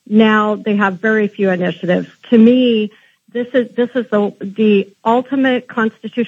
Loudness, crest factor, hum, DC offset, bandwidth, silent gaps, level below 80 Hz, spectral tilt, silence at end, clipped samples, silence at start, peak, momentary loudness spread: -15 LUFS; 14 dB; none; under 0.1%; 7.2 kHz; none; -74 dBFS; -8 dB/octave; 0 s; under 0.1%; 0.1 s; 0 dBFS; 8 LU